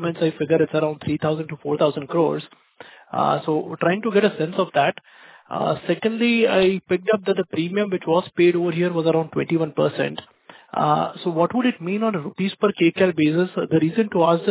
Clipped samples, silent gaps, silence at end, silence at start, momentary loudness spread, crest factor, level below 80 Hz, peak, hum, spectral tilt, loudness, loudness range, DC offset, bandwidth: under 0.1%; none; 0 s; 0 s; 7 LU; 16 dB; -60 dBFS; -4 dBFS; none; -10.5 dB/octave; -21 LUFS; 3 LU; under 0.1%; 4 kHz